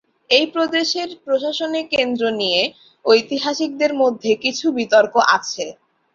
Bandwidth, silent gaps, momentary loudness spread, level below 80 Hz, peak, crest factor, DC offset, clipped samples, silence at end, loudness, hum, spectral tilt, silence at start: 7.6 kHz; none; 8 LU; -64 dBFS; -2 dBFS; 18 dB; under 0.1%; under 0.1%; 0.4 s; -18 LUFS; none; -2.5 dB/octave; 0.3 s